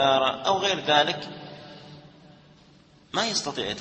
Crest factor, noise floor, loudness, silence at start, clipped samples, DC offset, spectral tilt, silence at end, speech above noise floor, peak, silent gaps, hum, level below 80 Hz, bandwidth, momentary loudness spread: 22 dB; -55 dBFS; -24 LUFS; 0 s; under 0.1%; under 0.1%; -2.5 dB/octave; 0 s; 31 dB; -4 dBFS; none; none; -64 dBFS; 8.8 kHz; 22 LU